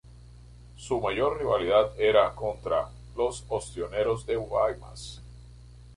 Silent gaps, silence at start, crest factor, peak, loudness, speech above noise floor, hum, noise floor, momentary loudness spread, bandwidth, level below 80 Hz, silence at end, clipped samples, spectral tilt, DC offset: none; 0.1 s; 20 dB; -8 dBFS; -27 LUFS; 22 dB; 60 Hz at -45 dBFS; -49 dBFS; 17 LU; 11.5 kHz; -48 dBFS; 0.05 s; under 0.1%; -5 dB/octave; under 0.1%